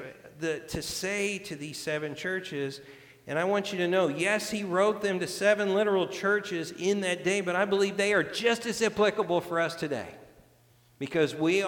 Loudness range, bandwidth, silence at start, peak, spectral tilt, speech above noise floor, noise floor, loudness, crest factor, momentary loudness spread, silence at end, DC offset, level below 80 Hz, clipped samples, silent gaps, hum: 5 LU; 19 kHz; 0 s; -12 dBFS; -4 dB/octave; 33 dB; -61 dBFS; -28 LUFS; 18 dB; 10 LU; 0 s; under 0.1%; -62 dBFS; under 0.1%; none; none